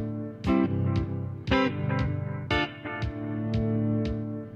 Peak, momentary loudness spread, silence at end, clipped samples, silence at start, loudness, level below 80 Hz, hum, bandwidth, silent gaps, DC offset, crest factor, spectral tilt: -12 dBFS; 8 LU; 0 s; under 0.1%; 0 s; -29 LUFS; -42 dBFS; none; 7.4 kHz; none; under 0.1%; 16 dB; -8 dB/octave